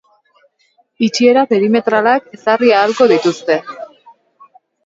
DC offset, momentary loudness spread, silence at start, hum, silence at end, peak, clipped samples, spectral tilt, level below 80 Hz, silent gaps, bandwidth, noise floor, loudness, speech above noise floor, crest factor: under 0.1%; 8 LU; 1 s; none; 1 s; 0 dBFS; under 0.1%; -4.5 dB/octave; -64 dBFS; none; 7.8 kHz; -58 dBFS; -13 LUFS; 46 dB; 14 dB